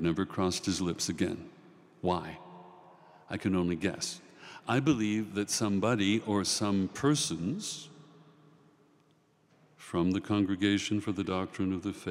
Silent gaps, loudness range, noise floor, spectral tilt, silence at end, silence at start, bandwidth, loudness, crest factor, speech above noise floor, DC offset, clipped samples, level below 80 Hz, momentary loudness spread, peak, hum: none; 6 LU; -67 dBFS; -4.5 dB/octave; 0 s; 0 s; 16 kHz; -31 LUFS; 18 dB; 37 dB; under 0.1%; under 0.1%; -68 dBFS; 15 LU; -14 dBFS; none